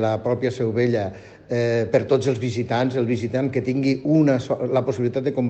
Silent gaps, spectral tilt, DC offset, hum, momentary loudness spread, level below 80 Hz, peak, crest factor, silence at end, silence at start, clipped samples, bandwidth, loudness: none; -7.5 dB/octave; under 0.1%; none; 5 LU; -58 dBFS; -4 dBFS; 16 dB; 0 s; 0 s; under 0.1%; 8.6 kHz; -22 LUFS